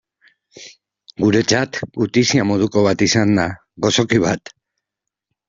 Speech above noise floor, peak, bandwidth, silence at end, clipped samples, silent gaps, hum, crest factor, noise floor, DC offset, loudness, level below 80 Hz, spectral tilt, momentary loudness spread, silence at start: 66 dB; 0 dBFS; 7.8 kHz; 1.1 s; under 0.1%; none; none; 18 dB; -83 dBFS; under 0.1%; -17 LUFS; -52 dBFS; -4.5 dB/octave; 7 LU; 0.55 s